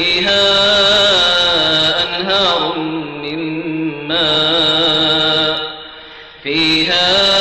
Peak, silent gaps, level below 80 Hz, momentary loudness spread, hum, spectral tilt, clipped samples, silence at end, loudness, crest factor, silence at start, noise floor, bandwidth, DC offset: -4 dBFS; none; -42 dBFS; 12 LU; none; -3 dB/octave; under 0.1%; 0 s; -12 LUFS; 10 dB; 0 s; -35 dBFS; 12 kHz; under 0.1%